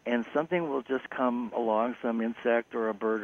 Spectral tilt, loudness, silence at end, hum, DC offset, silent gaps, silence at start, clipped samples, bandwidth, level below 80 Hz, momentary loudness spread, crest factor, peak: -7.5 dB/octave; -30 LUFS; 0 s; none; under 0.1%; none; 0.05 s; under 0.1%; 6.6 kHz; -74 dBFS; 3 LU; 16 dB; -14 dBFS